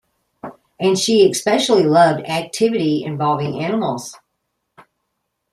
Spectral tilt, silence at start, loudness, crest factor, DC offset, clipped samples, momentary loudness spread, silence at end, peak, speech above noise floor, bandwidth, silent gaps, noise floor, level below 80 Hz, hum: -4.5 dB/octave; 0.45 s; -17 LUFS; 16 dB; under 0.1%; under 0.1%; 21 LU; 1.35 s; -2 dBFS; 58 dB; 14.5 kHz; none; -74 dBFS; -62 dBFS; none